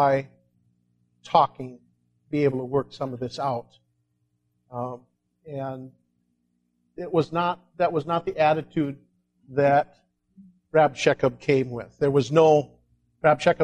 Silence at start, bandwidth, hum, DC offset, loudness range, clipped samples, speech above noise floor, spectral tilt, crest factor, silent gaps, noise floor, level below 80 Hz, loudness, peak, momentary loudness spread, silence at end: 0 s; 9.8 kHz; 60 Hz at -55 dBFS; under 0.1%; 12 LU; under 0.1%; 50 dB; -6.5 dB/octave; 20 dB; none; -73 dBFS; -62 dBFS; -24 LUFS; -4 dBFS; 17 LU; 0 s